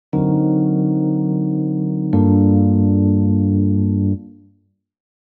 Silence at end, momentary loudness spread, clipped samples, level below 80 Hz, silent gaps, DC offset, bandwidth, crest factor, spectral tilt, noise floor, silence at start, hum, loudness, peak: 0.95 s; 6 LU; under 0.1%; -52 dBFS; none; under 0.1%; 2.3 kHz; 14 dB; -15 dB/octave; -59 dBFS; 0.15 s; none; -17 LUFS; -2 dBFS